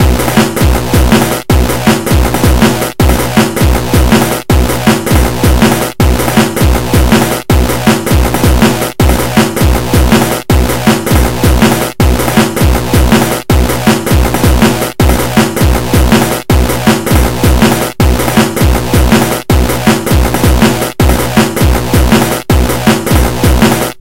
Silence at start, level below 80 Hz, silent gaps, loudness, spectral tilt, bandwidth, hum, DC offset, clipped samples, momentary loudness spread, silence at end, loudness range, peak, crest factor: 0 s; -14 dBFS; none; -9 LUFS; -5 dB/octave; 17.5 kHz; none; under 0.1%; 1%; 3 LU; 0 s; 0 LU; 0 dBFS; 8 dB